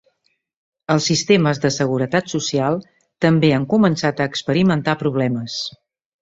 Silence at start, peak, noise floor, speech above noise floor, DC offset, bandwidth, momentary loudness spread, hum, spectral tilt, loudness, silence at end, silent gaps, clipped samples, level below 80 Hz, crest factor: 0.9 s; -2 dBFS; -68 dBFS; 51 dB; under 0.1%; 8 kHz; 8 LU; none; -5.5 dB/octave; -18 LUFS; 0.55 s; none; under 0.1%; -56 dBFS; 18 dB